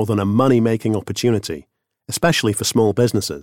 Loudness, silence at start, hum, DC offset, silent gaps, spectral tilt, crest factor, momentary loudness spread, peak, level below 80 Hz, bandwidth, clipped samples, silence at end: -18 LUFS; 0 s; none; 0.2%; none; -5 dB/octave; 16 dB; 8 LU; -2 dBFS; -50 dBFS; 17 kHz; under 0.1%; 0 s